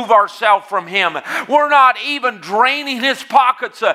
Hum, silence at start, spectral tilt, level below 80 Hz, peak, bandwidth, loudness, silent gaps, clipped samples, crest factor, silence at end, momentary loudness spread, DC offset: none; 0 s; -2.5 dB/octave; -78 dBFS; 0 dBFS; 15.5 kHz; -14 LUFS; none; under 0.1%; 14 dB; 0 s; 8 LU; under 0.1%